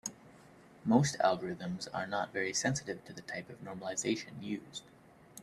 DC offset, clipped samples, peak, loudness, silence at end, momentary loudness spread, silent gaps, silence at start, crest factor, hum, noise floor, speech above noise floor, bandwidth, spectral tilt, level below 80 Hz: under 0.1%; under 0.1%; -12 dBFS; -35 LUFS; 0 s; 15 LU; none; 0.05 s; 24 dB; none; -58 dBFS; 23 dB; 14 kHz; -4.5 dB/octave; -70 dBFS